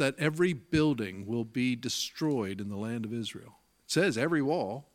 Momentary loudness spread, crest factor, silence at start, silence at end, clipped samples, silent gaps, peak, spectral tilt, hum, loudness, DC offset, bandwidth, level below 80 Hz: 8 LU; 20 dB; 0 s; 0.1 s; under 0.1%; none; -10 dBFS; -5 dB/octave; none; -31 LUFS; under 0.1%; 16.5 kHz; -62 dBFS